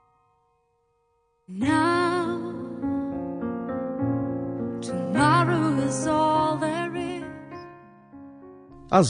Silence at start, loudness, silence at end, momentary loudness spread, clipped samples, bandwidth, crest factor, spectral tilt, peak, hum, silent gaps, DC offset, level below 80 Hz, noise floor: 1.5 s; -25 LUFS; 0 s; 19 LU; under 0.1%; 10 kHz; 22 dB; -6 dB/octave; -4 dBFS; none; none; under 0.1%; -58 dBFS; -69 dBFS